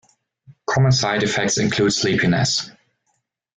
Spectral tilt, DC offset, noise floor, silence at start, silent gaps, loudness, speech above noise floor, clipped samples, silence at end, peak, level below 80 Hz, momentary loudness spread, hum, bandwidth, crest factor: -4 dB/octave; under 0.1%; -71 dBFS; 0.5 s; none; -18 LUFS; 53 dB; under 0.1%; 0.85 s; -6 dBFS; -50 dBFS; 7 LU; none; 9.4 kHz; 14 dB